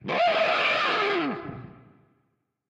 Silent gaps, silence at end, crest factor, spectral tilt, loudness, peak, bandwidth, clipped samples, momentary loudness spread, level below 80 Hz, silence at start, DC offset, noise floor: none; 0.95 s; 16 dB; -4.5 dB/octave; -23 LUFS; -12 dBFS; 9.4 kHz; under 0.1%; 16 LU; -66 dBFS; 0.05 s; under 0.1%; -74 dBFS